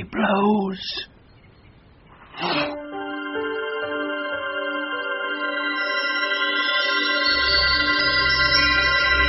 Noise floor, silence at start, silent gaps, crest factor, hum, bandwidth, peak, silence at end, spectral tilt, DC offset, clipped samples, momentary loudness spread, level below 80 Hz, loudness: -50 dBFS; 0 s; none; 16 dB; none; 6 kHz; -6 dBFS; 0 s; -0.5 dB/octave; under 0.1%; under 0.1%; 12 LU; -42 dBFS; -21 LUFS